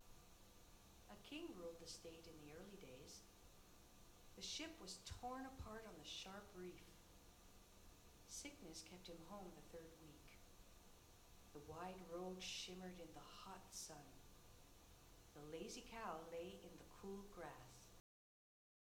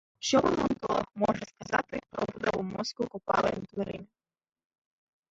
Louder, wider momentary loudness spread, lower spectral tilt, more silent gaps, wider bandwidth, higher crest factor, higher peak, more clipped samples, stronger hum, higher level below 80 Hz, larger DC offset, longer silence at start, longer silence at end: second, -56 LUFS vs -31 LUFS; first, 16 LU vs 10 LU; second, -3 dB/octave vs -4.5 dB/octave; neither; first, 19.5 kHz vs 8 kHz; about the same, 20 dB vs 20 dB; second, -38 dBFS vs -12 dBFS; neither; neither; second, -70 dBFS vs -58 dBFS; neither; second, 0 s vs 0.2 s; second, 1 s vs 1.25 s